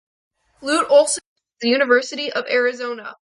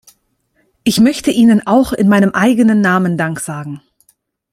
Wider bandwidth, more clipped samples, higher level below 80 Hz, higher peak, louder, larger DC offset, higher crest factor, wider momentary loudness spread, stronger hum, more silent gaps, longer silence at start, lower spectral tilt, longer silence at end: second, 11.5 kHz vs 15 kHz; neither; second, -68 dBFS vs -46 dBFS; about the same, -2 dBFS vs 0 dBFS; second, -19 LUFS vs -12 LUFS; neither; first, 18 dB vs 12 dB; about the same, 13 LU vs 13 LU; neither; first, 1.26-1.36 s vs none; second, 0.6 s vs 0.85 s; second, -1 dB/octave vs -5.5 dB/octave; second, 0.2 s vs 0.75 s